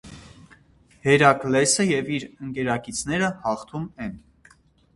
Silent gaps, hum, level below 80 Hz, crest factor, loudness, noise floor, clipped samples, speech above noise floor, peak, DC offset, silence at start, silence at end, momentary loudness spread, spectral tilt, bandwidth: none; none; -54 dBFS; 24 dB; -22 LUFS; -56 dBFS; under 0.1%; 34 dB; 0 dBFS; under 0.1%; 0.05 s; 0.75 s; 16 LU; -4 dB/octave; 11.5 kHz